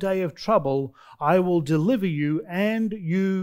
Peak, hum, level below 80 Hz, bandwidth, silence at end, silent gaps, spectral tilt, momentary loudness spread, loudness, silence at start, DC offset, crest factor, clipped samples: -6 dBFS; none; -58 dBFS; 16 kHz; 0 s; none; -8 dB/octave; 6 LU; -24 LUFS; 0 s; under 0.1%; 16 dB; under 0.1%